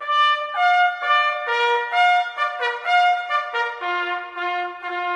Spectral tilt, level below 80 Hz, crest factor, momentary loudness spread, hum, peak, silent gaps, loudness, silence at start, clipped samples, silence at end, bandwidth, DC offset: 0.5 dB/octave; -76 dBFS; 14 dB; 9 LU; none; -6 dBFS; none; -20 LUFS; 0 s; under 0.1%; 0 s; 9.8 kHz; under 0.1%